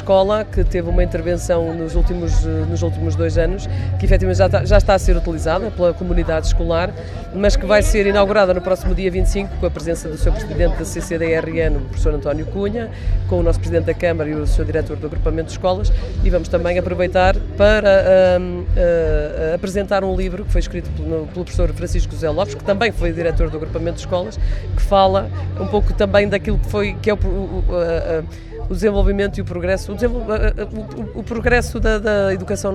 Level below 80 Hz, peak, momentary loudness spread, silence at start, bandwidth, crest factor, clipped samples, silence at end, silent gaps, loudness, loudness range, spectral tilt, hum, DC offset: -22 dBFS; 0 dBFS; 9 LU; 0 s; 12.5 kHz; 16 dB; under 0.1%; 0 s; none; -18 LUFS; 5 LU; -6.5 dB/octave; none; under 0.1%